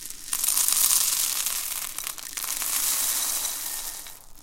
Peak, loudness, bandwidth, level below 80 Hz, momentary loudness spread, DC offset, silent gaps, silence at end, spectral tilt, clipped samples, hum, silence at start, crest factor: 0 dBFS; -23 LUFS; 17 kHz; -52 dBFS; 13 LU; under 0.1%; none; 0 s; 2.5 dB/octave; under 0.1%; none; 0 s; 26 dB